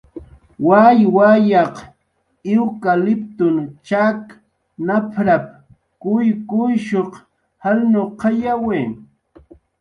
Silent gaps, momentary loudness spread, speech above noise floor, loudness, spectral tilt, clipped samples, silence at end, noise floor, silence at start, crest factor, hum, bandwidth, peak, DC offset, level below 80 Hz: none; 15 LU; 51 dB; -16 LUFS; -8.5 dB/octave; under 0.1%; 0.8 s; -66 dBFS; 0.15 s; 16 dB; none; 6.6 kHz; 0 dBFS; under 0.1%; -56 dBFS